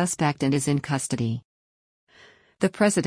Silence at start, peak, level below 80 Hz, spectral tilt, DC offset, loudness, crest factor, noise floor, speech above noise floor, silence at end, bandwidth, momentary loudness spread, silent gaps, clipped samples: 0 s; -8 dBFS; -60 dBFS; -5 dB/octave; under 0.1%; -25 LUFS; 18 dB; -55 dBFS; 31 dB; 0 s; 10.5 kHz; 6 LU; 1.45-2.07 s; under 0.1%